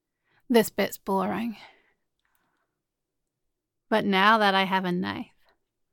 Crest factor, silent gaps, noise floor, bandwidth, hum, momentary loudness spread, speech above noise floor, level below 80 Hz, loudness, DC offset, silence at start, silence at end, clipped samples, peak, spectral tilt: 22 dB; none; -83 dBFS; 17.5 kHz; none; 16 LU; 59 dB; -68 dBFS; -24 LUFS; under 0.1%; 0.5 s; 0.7 s; under 0.1%; -4 dBFS; -5 dB/octave